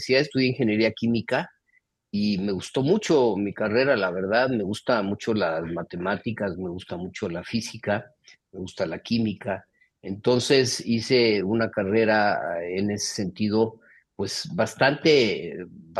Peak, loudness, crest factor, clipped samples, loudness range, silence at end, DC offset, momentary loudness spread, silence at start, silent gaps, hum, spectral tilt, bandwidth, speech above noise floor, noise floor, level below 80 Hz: -4 dBFS; -24 LUFS; 20 dB; under 0.1%; 7 LU; 0 s; under 0.1%; 12 LU; 0 s; none; none; -5 dB/octave; 12.5 kHz; 44 dB; -68 dBFS; -62 dBFS